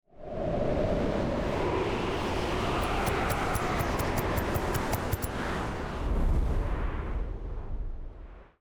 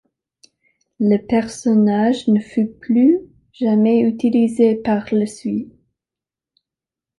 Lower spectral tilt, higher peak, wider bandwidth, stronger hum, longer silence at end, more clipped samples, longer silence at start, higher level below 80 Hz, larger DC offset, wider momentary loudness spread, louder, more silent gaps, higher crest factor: second, -5.5 dB/octave vs -7 dB/octave; second, -14 dBFS vs -4 dBFS; first, over 20 kHz vs 11.5 kHz; neither; second, 0.15 s vs 1.55 s; neither; second, 0.15 s vs 1 s; first, -34 dBFS vs -56 dBFS; neither; first, 11 LU vs 8 LU; second, -31 LUFS vs -17 LUFS; neither; about the same, 16 dB vs 14 dB